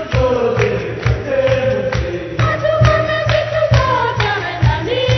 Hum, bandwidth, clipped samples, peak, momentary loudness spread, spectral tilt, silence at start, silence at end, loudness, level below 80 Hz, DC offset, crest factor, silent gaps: none; 6.4 kHz; under 0.1%; 0 dBFS; 6 LU; -6.5 dB/octave; 0 s; 0 s; -16 LUFS; -28 dBFS; under 0.1%; 14 dB; none